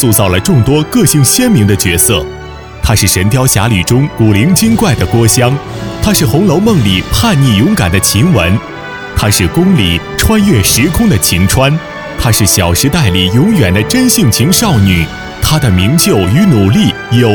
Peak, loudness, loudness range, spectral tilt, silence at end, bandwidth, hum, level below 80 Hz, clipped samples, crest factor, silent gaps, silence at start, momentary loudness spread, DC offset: 0 dBFS; -9 LUFS; 1 LU; -4.5 dB/octave; 0 s; over 20 kHz; none; -26 dBFS; 0.2%; 8 dB; none; 0 s; 6 LU; under 0.1%